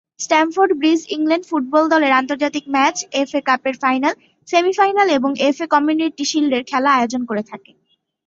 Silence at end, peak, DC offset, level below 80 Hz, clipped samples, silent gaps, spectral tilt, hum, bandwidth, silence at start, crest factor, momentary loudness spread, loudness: 0.7 s; -2 dBFS; under 0.1%; -66 dBFS; under 0.1%; none; -2.5 dB/octave; none; 8 kHz; 0.2 s; 16 dB; 6 LU; -17 LUFS